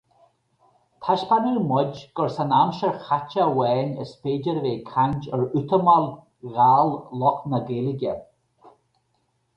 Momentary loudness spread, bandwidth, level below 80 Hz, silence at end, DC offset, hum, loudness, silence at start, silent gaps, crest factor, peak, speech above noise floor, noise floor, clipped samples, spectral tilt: 11 LU; 8 kHz; -60 dBFS; 0.9 s; under 0.1%; none; -23 LUFS; 1 s; none; 18 dB; -4 dBFS; 48 dB; -70 dBFS; under 0.1%; -8.5 dB/octave